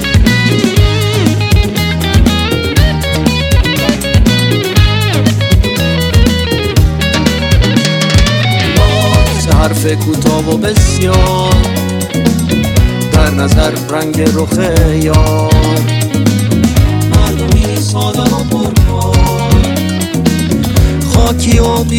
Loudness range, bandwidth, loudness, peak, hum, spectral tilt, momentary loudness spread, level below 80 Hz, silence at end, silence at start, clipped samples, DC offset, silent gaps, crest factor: 1 LU; 18 kHz; -10 LUFS; 0 dBFS; none; -5.5 dB/octave; 3 LU; -16 dBFS; 0 s; 0 s; 2%; under 0.1%; none; 10 dB